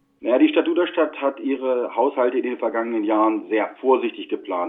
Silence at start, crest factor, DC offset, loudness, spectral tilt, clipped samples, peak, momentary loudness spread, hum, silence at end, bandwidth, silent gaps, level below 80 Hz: 0.2 s; 16 dB; under 0.1%; -21 LUFS; -8 dB/octave; under 0.1%; -4 dBFS; 7 LU; none; 0 s; 3.9 kHz; none; -74 dBFS